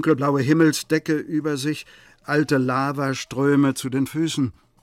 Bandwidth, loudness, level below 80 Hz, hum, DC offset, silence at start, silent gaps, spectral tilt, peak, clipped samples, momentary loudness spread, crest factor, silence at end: 16 kHz; -22 LUFS; -60 dBFS; none; under 0.1%; 0 s; none; -5.5 dB/octave; -6 dBFS; under 0.1%; 8 LU; 16 dB; 0.3 s